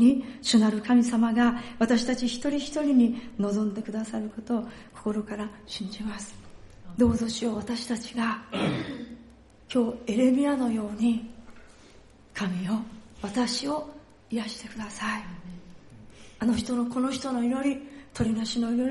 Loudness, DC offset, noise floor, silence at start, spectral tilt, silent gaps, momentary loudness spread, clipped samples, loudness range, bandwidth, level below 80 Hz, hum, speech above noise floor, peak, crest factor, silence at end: -27 LUFS; under 0.1%; -53 dBFS; 0 s; -5 dB/octave; none; 16 LU; under 0.1%; 8 LU; 11.5 kHz; -54 dBFS; none; 26 dB; -10 dBFS; 18 dB; 0 s